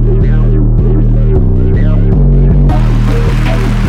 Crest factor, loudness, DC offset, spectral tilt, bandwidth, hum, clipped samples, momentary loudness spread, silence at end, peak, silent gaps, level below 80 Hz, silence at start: 6 dB; -10 LUFS; under 0.1%; -9 dB/octave; 6.4 kHz; none; under 0.1%; 3 LU; 0 s; -2 dBFS; none; -10 dBFS; 0 s